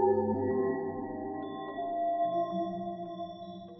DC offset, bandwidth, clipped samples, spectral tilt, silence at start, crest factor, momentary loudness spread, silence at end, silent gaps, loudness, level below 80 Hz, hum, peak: under 0.1%; 6 kHz; under 0.1%; -6.5 dB/octave; 0 s; 18 dB; 10 LU; 0 s; none; -34 LUFS; -70 dBFS; none; -16 dBFS